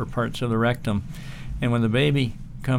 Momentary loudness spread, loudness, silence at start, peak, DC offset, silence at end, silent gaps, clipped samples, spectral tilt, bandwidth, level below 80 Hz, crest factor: 14 LU; -24 LUFS; 0 s; -8 dBFS; under 0.1%; 0 s; none; under 0.1%; -7 dB/octave; 16 kHz; -38 dBFS; 16 dB